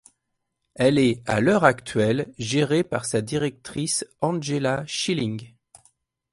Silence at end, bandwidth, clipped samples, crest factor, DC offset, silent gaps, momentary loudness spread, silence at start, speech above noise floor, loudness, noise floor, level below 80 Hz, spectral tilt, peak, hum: 0.85 s; 11.5 kHz; under 0.1%; 22 dB; under 0.1%; none; 8 LU; 0.8 s; 55 dB; -23 LUFS; -78 dBFS; -56 dBFS; -5 dB/octave; -2 dBFS; none